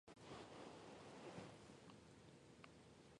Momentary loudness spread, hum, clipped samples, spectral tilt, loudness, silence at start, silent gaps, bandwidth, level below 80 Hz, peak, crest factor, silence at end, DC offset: 8 LU; none; under 0.1%; -5 dB/octave; -61 LUFS; 0.05 s; none; 11 kHz; -80 dBFS; -40 dBFS; 22 dB; 0 s; under 0.1%